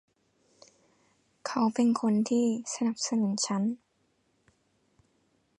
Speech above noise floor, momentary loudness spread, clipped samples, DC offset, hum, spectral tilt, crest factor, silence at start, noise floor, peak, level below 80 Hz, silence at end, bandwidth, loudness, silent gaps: 45 dB; 8 LU; under 0.1%; under 0.1%; none; -4.5 dB/octave; 16 dB; 1.45 s; -72 dBFS; -16 dBFS; -78 dBFS; 1.85 s; 11 kHz; -28 LUFS; none